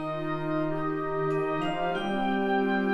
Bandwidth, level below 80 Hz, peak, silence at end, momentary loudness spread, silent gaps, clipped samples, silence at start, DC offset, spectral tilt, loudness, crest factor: 11 kHz; -56 dBFS; -16 dBFS; 0 s; 4 LU; none; under 0.1%; 0 s; under 0.1%; -7.5 dB/octave; -29 LUFS; 12 dB